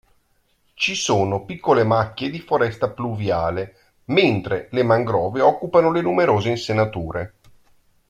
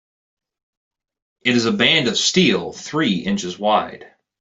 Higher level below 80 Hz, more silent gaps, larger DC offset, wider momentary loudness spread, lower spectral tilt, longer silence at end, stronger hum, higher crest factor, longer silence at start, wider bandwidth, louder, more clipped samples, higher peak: first, -52 dBFS vs -58 dBFS; neither; neither; about the same, 9 LU vs 9 LU; first, -5.5 dB/octave vs -3.5 dB/octave; first, 0.85 s vs 0.35 s; neither; about the same, 18 dB vs 20 dB; second, 0.8 s vs 1.45 s; first, 12.5 kHz vs 8.2 kHz; about the same, -20 LUFS vs -18 LUFS; neither; about the same, -2 dBFS vs 0 dBFS